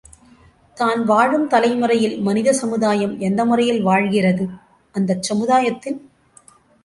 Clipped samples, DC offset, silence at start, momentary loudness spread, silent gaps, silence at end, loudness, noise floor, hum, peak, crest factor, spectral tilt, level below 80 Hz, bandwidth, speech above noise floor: under 0.1%; under 0.1%; 0.75 s; 8 LU; none; 0.85 s; -18 LUFS; -51 dBFS; none; -2 dBFS; 16 dB; -5.5 dB/octave; -60 dBFS; 11.5 kHz; 33 dB